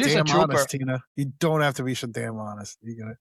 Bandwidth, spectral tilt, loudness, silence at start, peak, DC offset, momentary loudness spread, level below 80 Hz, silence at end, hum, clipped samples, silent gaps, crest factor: 14.5 kHz; -5 dB/octave; -24 LUFS; 0 s; -8 dBFS; under 0.1%; 18 LU; -62 dBFS; 0.05 s; none; under 0.1%; 1.07-1.15 s; 16 dB